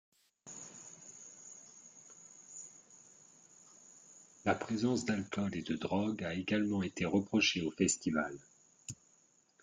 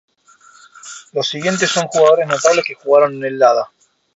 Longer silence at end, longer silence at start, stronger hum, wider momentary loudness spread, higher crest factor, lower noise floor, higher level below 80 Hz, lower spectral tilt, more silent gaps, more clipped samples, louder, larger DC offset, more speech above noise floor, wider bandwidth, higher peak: first, 0.7 s vs 0.5 s; second, 0.45 s vs 0.85 s; neither; first, 24 LU vs 13 LU; about the same, 20 dB vs 16 dB; first, -70 dBFS vs -48 dBFS; second, -72 dBFS vs -64 dBFS; about the same, -4 dB/octave vs -3 dB/octave; neither; neither; second, -35 LUFS vs -15 LUFS; neither; about the same, 36 dB vs 34 dB; first, 9.6 kHz vs 8.2 kHz; second, -18 dBFS vs 0 dBFS